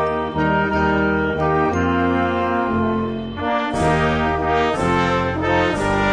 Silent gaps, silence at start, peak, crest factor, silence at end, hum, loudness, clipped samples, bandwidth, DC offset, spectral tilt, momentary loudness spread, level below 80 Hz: none; 0 s; -6 dBFS; 12 dB; 0 s; none; -19 LUFS; under 0.1%; 10.5 kHz; under 0.1%; -6.5 dB/octave; 3 LU; -36 dBFS